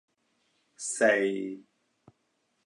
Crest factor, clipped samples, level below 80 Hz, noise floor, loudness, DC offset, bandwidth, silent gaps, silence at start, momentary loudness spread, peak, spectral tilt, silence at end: 20 dB; under 0.1%; -84 dBFS; -76 dBFS; -28 LUFS; under 0.1%; 11.5 kHz; none; 0.8 s; 15 LU; -12 dBFS; -3 dB/octave; 1.05 s